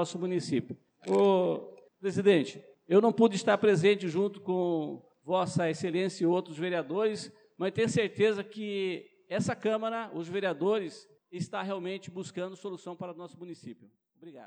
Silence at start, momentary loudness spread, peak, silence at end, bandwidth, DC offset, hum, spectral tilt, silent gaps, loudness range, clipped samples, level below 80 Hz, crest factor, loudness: 0 s; 17 LU; -12 dBFS; 0 s; 10 kHz; under 0.1%; none; -6 dB/octave; none; 8 LU; under 0.1%; -82 dBFS; 18 dB; -30 LUFS